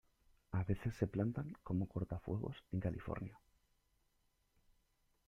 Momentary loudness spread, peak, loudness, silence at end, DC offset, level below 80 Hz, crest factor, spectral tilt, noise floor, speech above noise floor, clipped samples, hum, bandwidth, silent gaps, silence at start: 7 LU; -20 dBFS; -42 LUFS; 1.9 s; under 0.1%; -60 dBFS; 22 dB; -9 dB/octave; -79 dBFS; 38 dB; under 0.1%; none; 7.6 kHz; none; 0.5 s